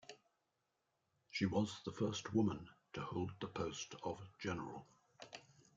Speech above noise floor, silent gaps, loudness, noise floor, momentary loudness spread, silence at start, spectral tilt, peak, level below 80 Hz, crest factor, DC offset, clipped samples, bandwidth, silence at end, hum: 44 dB; none; -43 LUFS; -86 dBFS; 18 LU; 0.1 s; -5.5 dB/octave; -24 dBFS; -74 dBFS; 20 dB; under 0.1%; under 0.1%; 7.8 kHz; 0.35 s; none